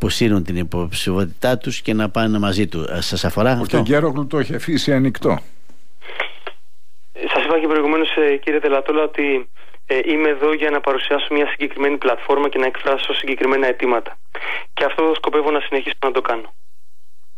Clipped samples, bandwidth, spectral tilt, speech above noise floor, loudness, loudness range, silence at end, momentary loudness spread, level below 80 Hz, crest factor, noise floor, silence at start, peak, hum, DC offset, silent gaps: under 0.1%; 15.5 kHz; -5.5 dB/octave; 47 dB; -19 LUFS; 3 LU; 0.9 s; 7 LU; -44 dBFS; 14 dB; -66 dBFS; 0 s; -6 dBFS; none; 5%; none